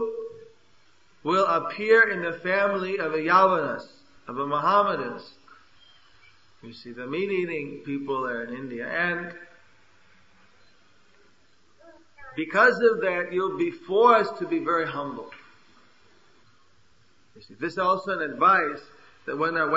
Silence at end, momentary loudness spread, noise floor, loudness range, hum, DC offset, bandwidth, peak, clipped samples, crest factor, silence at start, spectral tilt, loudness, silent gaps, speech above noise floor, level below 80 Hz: 0 s; 20 LU; -63 dBFS; 11 LU; none; 0.1%; 7.8 kHz; -4 dBFS; under 0.1%; 22 dB; 0 s; -6 dB/octave; -24 LUFS; none; 39 dB; -72 dBFS